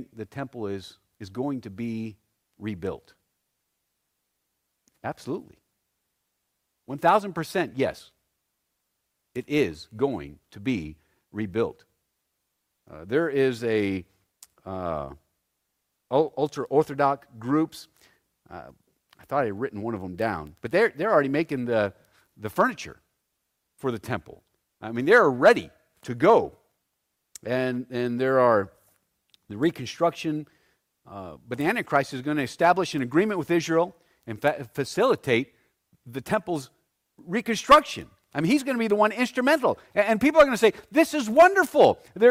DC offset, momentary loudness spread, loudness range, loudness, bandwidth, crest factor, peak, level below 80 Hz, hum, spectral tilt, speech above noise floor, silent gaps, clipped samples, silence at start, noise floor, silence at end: under 0.1%; 20 LU; 12 LU; -24 LUFS; 16 kHz; 20 dB; -6 dBFS; -60 dBFS; none; -5.5 dB/octave; 54 dB; none; under 0.1%; 0 s; -78 dBFS; 0 s